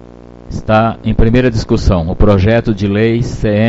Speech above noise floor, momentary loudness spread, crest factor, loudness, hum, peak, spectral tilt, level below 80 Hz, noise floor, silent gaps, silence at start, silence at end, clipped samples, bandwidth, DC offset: 24 dB; 4 LU; 12 dB; -12 LUFS; none; 0 dBFS; -7.5 dB/octave; -20 dBFS; -34 dBFS; none; 0.5 s; 0 s; 0.2%; 8 kHz; under 0.1%